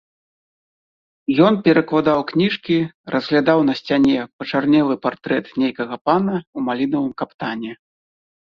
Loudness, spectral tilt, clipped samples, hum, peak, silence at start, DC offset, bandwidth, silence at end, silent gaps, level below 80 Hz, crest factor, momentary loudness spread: -19 LUFS; -8 dB/octave; under 0.1%; none; -2 dBFS; 1.3 s; under 0.1%; 6.6 kHz; 0.7 s; 2.94-3.04 s, 4.33-4.39 s, 6.01-6.05 s, 6.47-6.53 s, 7.34-7.39 s; -58 dBFS; 18 dB; 10 LU